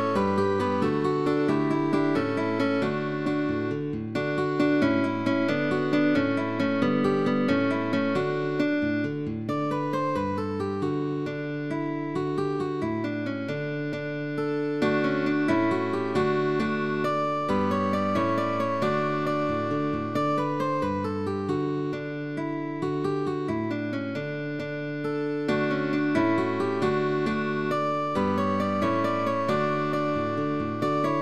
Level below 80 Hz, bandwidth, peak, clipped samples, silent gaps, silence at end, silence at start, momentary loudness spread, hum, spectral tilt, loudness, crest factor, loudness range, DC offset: -60 dBFS; 11 kHz; -12 dBFS; under 0.1%; none; 0 s; 0 s; 6 LU; none; -7.5 dB/octave; -26 LUFS; 14 dB; 4 LU; 0.3%